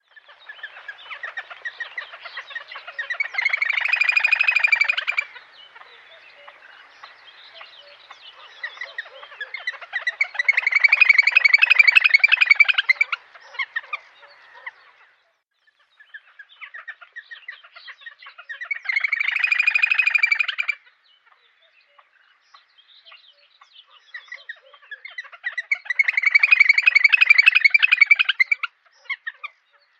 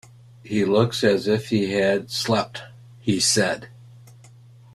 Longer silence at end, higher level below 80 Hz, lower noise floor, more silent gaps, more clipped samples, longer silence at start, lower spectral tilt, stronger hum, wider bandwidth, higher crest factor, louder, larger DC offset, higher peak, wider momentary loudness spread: about the same, 0.55 s vs 0.65 s; second, -90 dBFS vs -58 dBFS; first, -67 dBFS vs -48 dBFS; neither; neither; about the same, 0.5 s vs 0.45 s; second, 4 dB/octave vs -4 dB/octave; neither; second, 8.4 kHz vs 15 kHz; about the same, 22 dB vs 20 dB; first, -16 LUFS vs -22 LUFS; neither; about the same, -2 dBFS vs -4 dBFS; first, 25 LU vs 11 LU